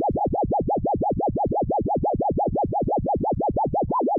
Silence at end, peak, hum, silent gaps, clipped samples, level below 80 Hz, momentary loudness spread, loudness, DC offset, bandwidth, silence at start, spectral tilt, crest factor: 0 s; -14 dBFS; none; none; under 0.1%; -38 dBFS; 1 LU; -24 LUFS; under 0.1%; 1.4 kHz; 0 s; -14.5 dB/octave; 8 dB